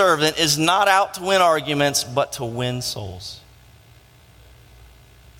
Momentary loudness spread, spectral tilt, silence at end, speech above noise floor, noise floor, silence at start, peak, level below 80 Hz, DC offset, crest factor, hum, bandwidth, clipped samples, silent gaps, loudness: 16 LU; -3 dB/octave; 2 s; 30 dB; -50 dBFS; 0 s; -2 dBFS; -52 dBFS; under 0.1%; 20 dB; none; 17 kHz; under 0.1%; none; -19 LUFS